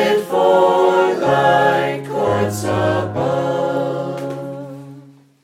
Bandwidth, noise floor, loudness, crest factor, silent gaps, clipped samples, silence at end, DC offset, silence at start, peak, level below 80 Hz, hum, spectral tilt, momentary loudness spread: 16 kHz; -43 dBFS; -17 LUFS; 14 dB; none; under 0.1%; 0.45 s; under 0.1%; 0 s; -2 dBFS; -56 dBFS; none; -6 dB/octave; 14 LU